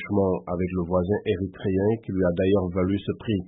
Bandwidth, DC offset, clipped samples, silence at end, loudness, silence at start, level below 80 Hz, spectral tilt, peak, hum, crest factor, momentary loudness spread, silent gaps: 3.9 kHz; under 0.1%; under 0.1%; 0 s; -25 LUFS; 0 s; -50 dBFS; -12.5 dB/octave; -10 dBFS; none; 14 dB; 5 LU; none